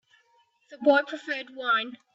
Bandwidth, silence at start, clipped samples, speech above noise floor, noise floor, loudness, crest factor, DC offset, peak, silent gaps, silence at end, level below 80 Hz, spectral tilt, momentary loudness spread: 7.8 kHz; 0.7 s; under 0.1%; 40 dB; -66 dBFS; -26 LUFS; 20 dB; under 0.1%; -8 dBFS; none; 0.2 s; -84 dBFS; -3.5 dB/octave; 10 LU